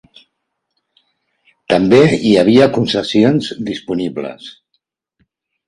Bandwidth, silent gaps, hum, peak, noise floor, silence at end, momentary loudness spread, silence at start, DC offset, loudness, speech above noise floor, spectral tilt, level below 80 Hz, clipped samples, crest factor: 11 kHz; none; none; 0 dBFS; -73 dBFS; 1.2 s; 16 LU; 1.7 s; under 0.1%; -13 LUFS; 60 dB; -6.5 dB/octave; -50 dBFS; under 0.1%; 16 dB